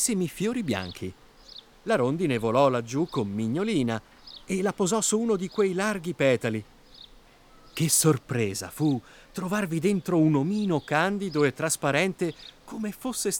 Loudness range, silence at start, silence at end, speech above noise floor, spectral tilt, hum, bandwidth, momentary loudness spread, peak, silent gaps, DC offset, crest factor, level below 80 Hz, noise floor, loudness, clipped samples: 2 LU; 0 s; 0 s; 28 dB; -4.5 dB/octave; none; over 20 kHz; 14 LU; -8 dBFS; none; under 0.1%; 18 dB; -58 dBFS; -54 dBFS; -26 LUFS; under 0.1%